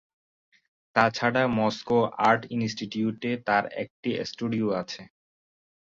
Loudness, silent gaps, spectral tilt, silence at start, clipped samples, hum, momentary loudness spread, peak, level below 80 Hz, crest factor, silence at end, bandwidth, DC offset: -26 LUFS; 3.90-4.03 s; -5.5 dB/octave; 0.95 s; under 0.1%; none; 9 LU; -6 dBFS; -62 dBFS; 22 dB; 0.85 s; 7.6 kHz; under 0.1%